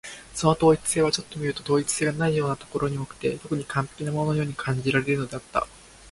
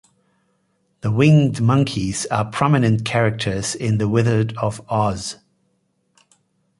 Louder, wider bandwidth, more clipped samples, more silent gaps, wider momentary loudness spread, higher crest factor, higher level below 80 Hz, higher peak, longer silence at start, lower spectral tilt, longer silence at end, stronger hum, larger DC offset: second, -25 LUFS vs -19 LUFS; about the same, 11.5 kHz vs 11.5 kHz; neither; neither; about the same, 9 LU vs 10 LU; about the same, 20 dB vs 18 dB; about the same, -52 dBFS vs -48 dBFS; second, -6 dBFS vs -2 dBFS; second, 0.05 s vs 1.05 s; about the same, -5 dB/octave vs -6 dB/octave; second, 0 s vs 1.45 s; neither; neither